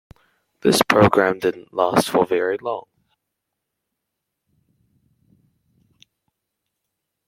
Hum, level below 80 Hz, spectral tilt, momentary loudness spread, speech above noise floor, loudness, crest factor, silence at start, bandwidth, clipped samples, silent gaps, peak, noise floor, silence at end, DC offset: none; -58 dBFS; -4.5 dB/octave; 11 LU; 62 dB; -19 LUFS; 22 dB; 0.65 s; 16.5 kHz; under 0.1%; none; 0 dBFS; -80 dBFS; 4.45 s; under 0.1%